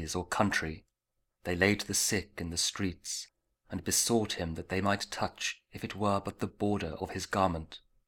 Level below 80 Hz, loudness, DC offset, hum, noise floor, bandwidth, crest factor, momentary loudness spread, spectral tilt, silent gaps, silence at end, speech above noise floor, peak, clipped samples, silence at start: -54 dBFS; -32 LUFS; under 0.1%; none; -83 dBFS; 19 kHz; 24 dB; 13 LU; -3.5 dB/octave; none; 0.3 s; 50 dB; -10 dBFS; under 0.1%; 0 s